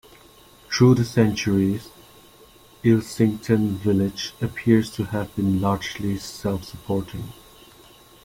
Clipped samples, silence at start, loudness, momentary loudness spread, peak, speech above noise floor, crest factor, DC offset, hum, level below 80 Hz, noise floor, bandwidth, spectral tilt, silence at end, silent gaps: under 0.1%; 0.7 s; -22 LUFS; 10 LU; -4 dBFS; 29 dB; 20 dB; under 0.1%; none; -50 dBFS; -50 dBFS; 16.5 kHz; -6.5 dB/octave; 0.9 s; none